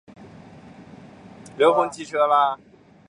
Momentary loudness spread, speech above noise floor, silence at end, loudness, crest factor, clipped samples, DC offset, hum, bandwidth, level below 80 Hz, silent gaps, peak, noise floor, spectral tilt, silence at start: 15 LU; 25 dB; 0.55 s; -20 LUFS; 20 dB; under 0.1%; under 0.1%; none; 11 kHz; -64 dBFS; none; -4 dBFS; -45 dBFS; -4.5 dB/octave; 0.2 s